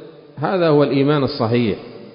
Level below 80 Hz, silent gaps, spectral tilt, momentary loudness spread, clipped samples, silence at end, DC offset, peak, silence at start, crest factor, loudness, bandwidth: -52 dBFS; none; -12 dB/octave; 9 LU; under 0.1%; 0.05 s; under 0.1%; -2 dBFS; 0 s; 16 dB; -17 LUFS; 5.4 kHz